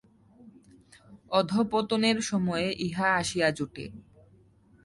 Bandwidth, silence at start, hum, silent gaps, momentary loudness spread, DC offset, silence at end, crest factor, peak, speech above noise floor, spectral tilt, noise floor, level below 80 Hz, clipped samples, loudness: 11.5 kHz; 0.4 s; none; none; 11 LU; under 0.1%; 0.85 s; 20 dB; -10 dBFS; 32 dB; -4.5 dB/octave; -60 dBFS; -60 dBFS; under 0.1%; -27 LUFS